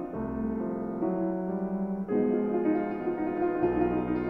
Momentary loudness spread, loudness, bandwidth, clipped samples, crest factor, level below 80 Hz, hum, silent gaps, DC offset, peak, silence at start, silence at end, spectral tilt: 5 LU; -30 LUFS; 3.8 kHz; under 0.1%; 14 dB; -52 dBFS; none; none; under 0.1%; -14 dBFS; 0 s; 0 s; -11 dB/octave